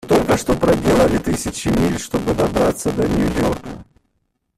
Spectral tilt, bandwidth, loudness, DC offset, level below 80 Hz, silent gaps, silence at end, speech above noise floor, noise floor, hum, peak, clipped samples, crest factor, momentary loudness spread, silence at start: -5.5 dB/octave; 15.5 kHz; -18 LUFS; under 0.1%; -34 dBFS; none; 0.75 s; 52 dB; -69 dBFS; none; -2 dBFS; under 0.1%; 16 dB; 7 LU; 0.05 s